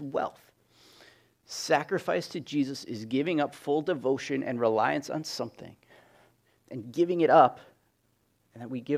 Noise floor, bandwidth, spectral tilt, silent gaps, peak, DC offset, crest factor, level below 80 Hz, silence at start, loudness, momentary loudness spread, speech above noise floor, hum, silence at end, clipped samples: -71 dBFS; 16 kHz; -5 dB/octave; none; -6 dBFS; under 0.1%; 24 dB; -76 dBFS; 0 s; -28 LUFS; 18 LU; 43 dB; none; 0 s; under 0.1%